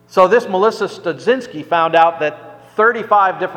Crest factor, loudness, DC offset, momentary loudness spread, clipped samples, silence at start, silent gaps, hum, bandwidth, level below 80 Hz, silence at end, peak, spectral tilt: 16 dB; -15 LUFS; under 0.1%; 9 LU; under 0.1%; 0.15 s; none; none; 12 kHz; -62 dBFS; 0 s; 0 dBFS; -5 dB/octave